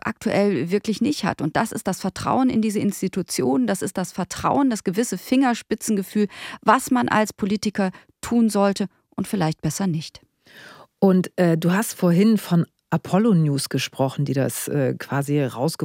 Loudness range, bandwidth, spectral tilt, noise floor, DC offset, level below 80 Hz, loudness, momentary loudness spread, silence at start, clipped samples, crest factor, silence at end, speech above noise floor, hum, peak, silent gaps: 3 LU; 16.5 kHz; -5.5 dB/octave; -47 dBFS; under 0.1%; -58 dBFS; -22 LUFS; 7 LU; 0.05 s; under 0.1%; 18 dB; 0 s; 26 dB; none; -2 dBFS; none